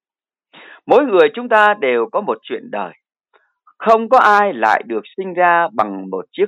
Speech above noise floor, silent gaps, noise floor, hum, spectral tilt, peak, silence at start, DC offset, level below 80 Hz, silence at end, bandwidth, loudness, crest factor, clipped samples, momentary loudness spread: over 75 dB; none; under -90 dBFS; none; -5.5 dB/octave; 0 dBFS; 0.85 s; under 0.1%; -68 dBFS; 0 s; 10.5 kHz; -15 LUFS; 16 dB; under 0.1%; 15 LU